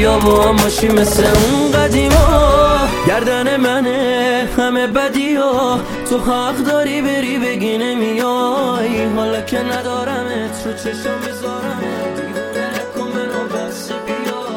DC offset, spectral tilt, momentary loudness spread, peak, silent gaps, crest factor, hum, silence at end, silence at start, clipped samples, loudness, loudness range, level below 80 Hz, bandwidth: under 0.1%; -4.5 dB/octave; 11 LU; 0 dBFS; none; 14 dB; none; 0 s; 0 s; under 0.1%; -15 LUFS; 9 LU; -26 dBFS; 17 kHz